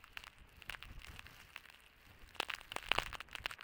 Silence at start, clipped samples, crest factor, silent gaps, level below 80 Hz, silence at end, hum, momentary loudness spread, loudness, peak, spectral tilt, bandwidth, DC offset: 0 s; under 0.1%; 36 dB; none; -60 dBFS; 0 s; none; 22 LU; -44 LUFS; -10 dBFS; -1.5 dB/octave; 18 kHz; under 0.1%